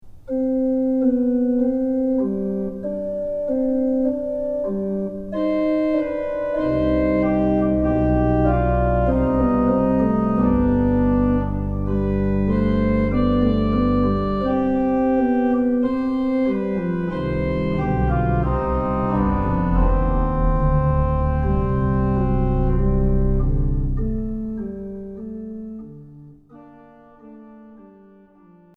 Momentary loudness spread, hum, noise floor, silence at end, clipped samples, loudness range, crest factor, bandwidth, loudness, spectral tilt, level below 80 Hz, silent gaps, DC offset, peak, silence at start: 7 LU; none; -50 dBFS; 0.9 s; under 0.1%; 6 LU; 14 dB; 5 kHz; -21 LUFS; -11 dB/octave; -26 dBFS; none; under 0.1%; -6 dBFS; 0.05 s